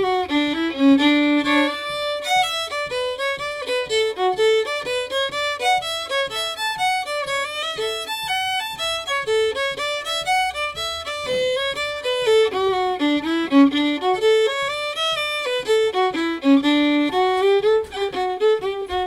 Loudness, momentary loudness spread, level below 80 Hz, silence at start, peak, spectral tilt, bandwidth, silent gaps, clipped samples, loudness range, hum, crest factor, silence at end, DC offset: -20 LUFS; 7 LU; -54 dBFS; 0 s; -4 dBFS; -2.5 dB/octave; 16 kHz; none; under 0.1%; 3 LU; none; 16 dB; 0 s; under 0.1%